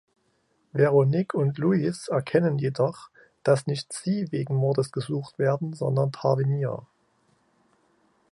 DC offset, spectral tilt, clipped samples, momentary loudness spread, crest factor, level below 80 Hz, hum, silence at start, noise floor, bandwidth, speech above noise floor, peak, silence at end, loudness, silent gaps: under 0.1%; -7.5 dB/octave; under 0.1%; 9 LU; 18 dB; -68 dBFS; none; 0.75 s; -69 dBFS; 11.5 kHz; 45 dB; -8 dBFS; 1.5 s; -25 LUFS; none